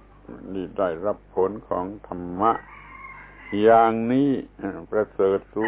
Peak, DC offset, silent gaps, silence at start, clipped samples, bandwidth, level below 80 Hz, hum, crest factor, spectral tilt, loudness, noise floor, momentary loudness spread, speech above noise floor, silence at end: -4 dBFS; under 0.1%; none; 0.3 s; under 0.1%; 4 kHz; -52 dBFS; none; 18 dB; -10.5 dB/octave; -23 LUFS; -42 dBFS; 23 LU; 19 dB; 0 s